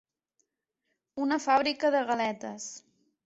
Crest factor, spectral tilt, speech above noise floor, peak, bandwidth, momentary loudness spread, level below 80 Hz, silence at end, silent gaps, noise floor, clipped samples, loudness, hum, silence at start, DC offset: 20 dB; -3 dB/octave; 54 dB; -12 dBFS; 8.2 kHz; 17 LU; -74 dBFS; 0.45 s; none; -83 dBFS; under 0.1%; -28 LUFS; none; 1.15 s; under 0.1%